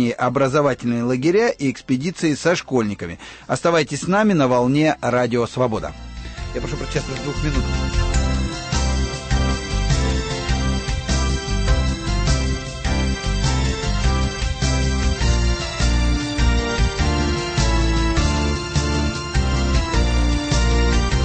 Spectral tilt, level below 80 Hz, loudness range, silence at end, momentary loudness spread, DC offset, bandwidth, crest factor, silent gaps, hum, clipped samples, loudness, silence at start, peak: -5 dB/octave; -24 dBFS; 3 LU; 0 s; 7 LU; under 0.1%; 8.8 kHz; 14 dB; none; none; under 0.1%; -20 LUFS; 0 s; -6 dBFS